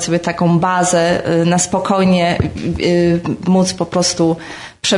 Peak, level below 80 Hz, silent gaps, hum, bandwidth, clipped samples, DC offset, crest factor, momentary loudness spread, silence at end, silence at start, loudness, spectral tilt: -4 dBFS; -42 dBFS; none; none; 11 kHz; under 0.1%; under 0.1%; 12 dB; 5 LU; 0 s; 0 s; -15 LUFS; -5 dB/octave